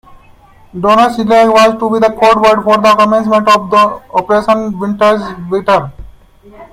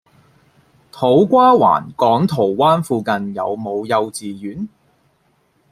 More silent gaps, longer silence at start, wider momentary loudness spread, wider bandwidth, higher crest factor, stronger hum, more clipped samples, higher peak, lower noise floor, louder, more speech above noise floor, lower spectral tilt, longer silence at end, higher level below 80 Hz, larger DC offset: neither; second, 0.75 s vs 0.95 s; second, 9 LU vs 17 LU; about the same, 15.5 kHz vs 15 kHz; second, 10 dB vs 16 dB; neither; neither; about the same, 0 dBFS vs -2 dBFS; second, -41 dBFS vs -60 dBFS; first, -10 LUFS vs -16 LUFS; second, 32 dB vs 45 dB; second, -5 dB/octave vs -6.5 dB/octave; second, 0.1 s vs 1.05 s; first, -42 dBFS vs -58 dBFS; neither